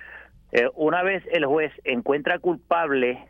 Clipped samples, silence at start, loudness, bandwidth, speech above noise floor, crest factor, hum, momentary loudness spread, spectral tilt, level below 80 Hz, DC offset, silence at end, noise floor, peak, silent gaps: under 0.1%; 0 s; -23 LUFS; 6.8 kHz; 23 dB; 18 dB; none; 4 LU; -6.5 dB/octave; -58 dBFS; under 0.1%; 0.05 s; -46 dBFS; -6 dBFS; none